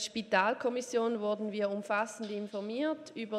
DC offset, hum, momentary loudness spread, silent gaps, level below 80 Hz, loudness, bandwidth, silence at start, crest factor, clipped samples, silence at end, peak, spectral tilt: under 0.1%; none; 9 LU; none; -80 dBFS; -33 LUFS; 13.5 kHz; 0 s; 18 dB; under 0.1%; 0 s; -14 dBFS; -4 dB/octave